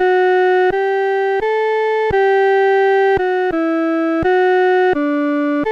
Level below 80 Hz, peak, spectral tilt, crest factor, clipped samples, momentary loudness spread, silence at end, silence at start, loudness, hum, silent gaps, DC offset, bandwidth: -46 dBFS; -8 dBFS; -6.5 dB/octave; 8 dB; under 0.1%; 4 LU; 0 s; 0 s; -15 LUFS; none; none; under 0.1%; 6.4 kHz